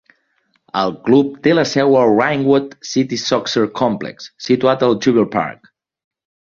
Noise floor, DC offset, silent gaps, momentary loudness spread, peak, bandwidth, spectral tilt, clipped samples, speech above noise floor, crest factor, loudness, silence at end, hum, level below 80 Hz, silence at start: -64 dBFS; under 0.1%; none; 8 LU; -2 dBFS; 7.4 kHz; -5.5 dB/octave; under 0.1%; 48 dB; 16 dB; -16 LUFS; 1.05 s; none; -58 dBFS; 0.75 s